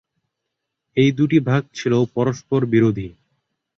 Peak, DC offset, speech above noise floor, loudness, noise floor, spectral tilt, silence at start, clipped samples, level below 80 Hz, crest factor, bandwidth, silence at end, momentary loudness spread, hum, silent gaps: -4 dBFS; under 0.1%; 61 dB; -19 LUFS; -79 dBFS; -7.5 dB/octave; 0.95 s; under 0.1%; -54 dBFS; 16 dB; 7.4 kHz; 0.65 s; 8 LU; none; none